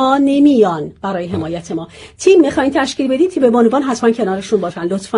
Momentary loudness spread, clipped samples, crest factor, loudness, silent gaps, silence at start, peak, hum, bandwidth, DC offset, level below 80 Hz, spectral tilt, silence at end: 11 LU; under 0.1%; 14 dB; -14 LUFS; none; 0 s; 0 dBFS; none; 10.5 kHz; under 0.1%; -48 dBFS; -5.5 dB/octave; 0 s